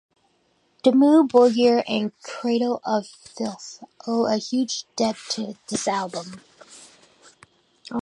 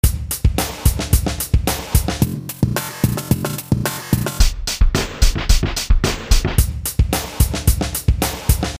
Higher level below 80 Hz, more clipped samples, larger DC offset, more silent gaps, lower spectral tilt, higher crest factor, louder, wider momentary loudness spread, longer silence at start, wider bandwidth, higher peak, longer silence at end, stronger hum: second, -70 dBFS vs -20 dBFS; neither; second, under 0.1% vs 0.1%; neither; about the same, -4.5 dB/octave vs -4.5 dB/octave; about the same, 20 dB vs 16 dB; second, -22 LUFS vs -19 LUFS; first, 17 LU vs 3 LU; first, 0.85 s vs 0.05 s; second, 11 kHz vs 16 kHz; second, -4 dBFS vs 0 dBFS; about the same, 0 s vs 0 s; neither